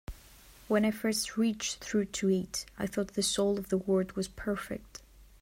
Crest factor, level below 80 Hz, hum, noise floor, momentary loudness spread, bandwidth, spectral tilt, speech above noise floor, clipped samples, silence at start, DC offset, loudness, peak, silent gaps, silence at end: 18 dB; -54 dBFS; none; -55 dBFS; 13 LU; 16 kHz; -4.5 dB/octave; 24 dB; under 0.1%; 0.1 s; under 0.1%; -31 LUFS; -16 dBFS; none; 0.15 s